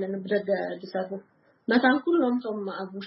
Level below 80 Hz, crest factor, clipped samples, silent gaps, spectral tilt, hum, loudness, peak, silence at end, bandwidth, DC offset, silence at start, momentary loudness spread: -80 dBFS; 20 dB; under 0.1%; none; -10 dB/octave; none; -26 LUFS; -8 dBFS; 0 s; 5.8 kHz; under 0.1%; 0 s; 14 LU